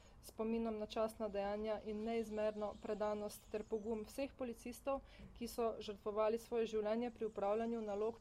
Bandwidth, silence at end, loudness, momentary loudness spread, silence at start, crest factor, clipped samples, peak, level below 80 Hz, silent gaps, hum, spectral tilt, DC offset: 16 kHz; 0 s; -43 LUFS; 7 LU; 0 s; 16 dB; under 0.1%; -26 dBFS; -64 dBFS; none; none; -5.5 dB/octave; under 0.1%